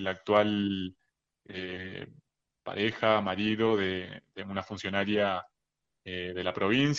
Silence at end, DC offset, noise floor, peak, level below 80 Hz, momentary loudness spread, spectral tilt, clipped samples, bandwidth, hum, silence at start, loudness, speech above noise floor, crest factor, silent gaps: 0 s; under 0.1%; -84 dBFS; -10 dBFS; -68 dBFS; 17 LU; -6 dB/octave; under 0.1%; 7.6 kHz; none; 0 s; -30 LUFS; 54 dB; 20 dB; none